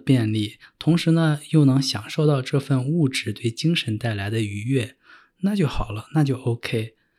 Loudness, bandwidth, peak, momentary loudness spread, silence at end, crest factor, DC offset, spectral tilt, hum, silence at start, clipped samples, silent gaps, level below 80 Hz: -23 LUFS; 13 kHz; -6 dBFS; 8 LU; 0.3 s; 16 dB; under 0.1%; -6.5 dB/octave; none; 0.05 s; under 0.1%; none; -44 dBFS